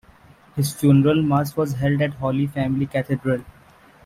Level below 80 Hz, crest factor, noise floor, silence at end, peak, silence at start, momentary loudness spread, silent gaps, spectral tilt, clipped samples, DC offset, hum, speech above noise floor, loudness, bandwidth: -50 dBFS; 16 dB; -50 dBFS; 0.55 s; -6 dBFS; 0.55 s; 9 LU; none; -7 dB/octave; under 0.1%; under 0.1%; none; 31 dB; -21 LUFS; 15.5 kHz